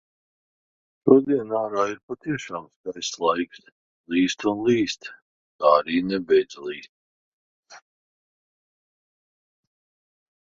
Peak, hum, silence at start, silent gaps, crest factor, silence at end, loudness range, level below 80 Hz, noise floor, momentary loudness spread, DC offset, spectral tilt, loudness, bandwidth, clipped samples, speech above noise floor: -2 dBFS; none; 1.05 s; 2.03-2.08 s, 2.76-2.84 s, 3.72-4.04 s, 5.22-5.59 s, 6.89-7.63 s; 24 dB; 2.7 s; 6 LU; -64 dBFS; under -90 dBFS; 16 LU; under 0.1%; -5 dB/octave; -23 LUFS; 7.8 kHz; under 0.1%; over 67 dB